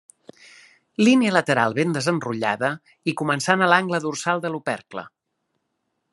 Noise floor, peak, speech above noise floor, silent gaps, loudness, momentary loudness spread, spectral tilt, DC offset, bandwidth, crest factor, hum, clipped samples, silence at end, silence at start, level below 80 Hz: -76 dBFS; -2 dBFS; 54 dB; none; -21 LUFS; 12 LU; -5 dB/octave; under 0.1%; 12 kHz; 22 dB; none; under 0.1%; 1.05 s; 1 s; -72 dBFS